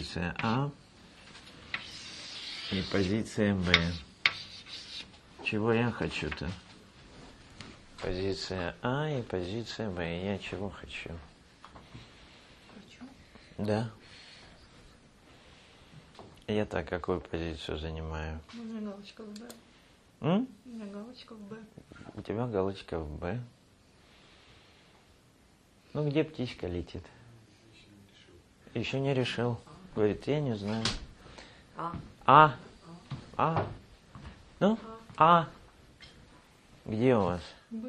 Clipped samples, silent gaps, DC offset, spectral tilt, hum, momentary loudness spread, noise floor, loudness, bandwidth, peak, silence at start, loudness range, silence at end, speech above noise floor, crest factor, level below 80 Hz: under 0.1%; none; under 0.1%; -6 dB/octave; none; 24 LU; -62 dBFS; -32 LUFS; 12 kHz; -2 dBFS; 0 s; 12 LU; 0 s; 31 dB; 30 dB; -54 dBFS